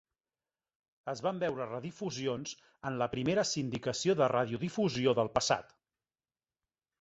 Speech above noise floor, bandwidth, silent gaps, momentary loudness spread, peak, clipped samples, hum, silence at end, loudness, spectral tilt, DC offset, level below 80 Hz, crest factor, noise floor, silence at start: over 57 dB; 8.2 kHz; none; 11 LU; -14 dBFS; under 0.1%; none; 1.35 s; -33 LUFS; -4.5 dB/octave; under 0.1%; -66 dBFS; 22 dB; under -90 dBFS; 1.05 s